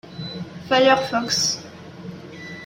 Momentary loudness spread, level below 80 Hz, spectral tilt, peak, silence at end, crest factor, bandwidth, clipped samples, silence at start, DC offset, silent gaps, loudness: 21 LU; -60 dBFS; -3 dB/octave; -4 dBFS; 0 s; 18 dB; 16.5 kHz; under 0.1%; 0.05 s; under 0.1%; none; -19 LUFS